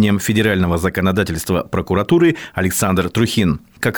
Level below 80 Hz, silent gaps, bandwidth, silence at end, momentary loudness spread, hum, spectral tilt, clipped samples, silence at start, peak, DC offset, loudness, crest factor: -42 dBFS; none; over 20 kHz; 0 s; 5 LU; none; -5.5 dB/octave; under 0.1%; 0 s; -4 dBFS; 0.2%; -17 LUFS; 14 dB